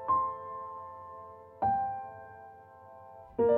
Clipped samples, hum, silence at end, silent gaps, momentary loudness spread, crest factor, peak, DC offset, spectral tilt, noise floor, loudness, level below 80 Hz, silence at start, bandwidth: under 0.1%; none; 0 s; none; 21 LU; 18 dB; -16 dBFS; under 0.1%; -9.5 dB/octave; -52 dBFS; -35 LUFS; -64 dBFS; 0 s; 3.8 kHz